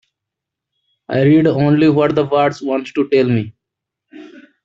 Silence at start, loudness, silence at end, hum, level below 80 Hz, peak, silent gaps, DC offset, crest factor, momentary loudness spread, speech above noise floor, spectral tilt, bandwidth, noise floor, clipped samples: 1.1 s; -15 LUFS; 0.4 s; none; -56 dBFS; -2 dBFS; none; under 0.1%; 14 dB; 9 LU; 68 dB; -8.5 dB/octave; 7.4 kHz; -82 dBFS; under 0.1%